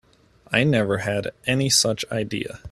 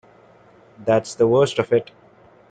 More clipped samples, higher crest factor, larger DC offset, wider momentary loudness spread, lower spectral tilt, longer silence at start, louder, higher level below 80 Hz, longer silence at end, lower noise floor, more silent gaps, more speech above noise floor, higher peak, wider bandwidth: neither; about the same, 22 dB vs 18 dB; neither; first, 9 LU vs 5 LU; second, -3.5 dB/octave vs -6 dB/octave; second, 0.5 s vs 0.8 s; about the same, -22 LUFS vs -20 LUFS; first, -54 dBFS vs -60 dBFS; second, 0 s vs 0.65 s; about the same, -54 dBFS vs -51 dBFS; neither; about the same, 32 dB vs 32 dB; about the same, -2 dBFS vs -4 dBFS; first, 14.5 kHz vs 9.4 kHz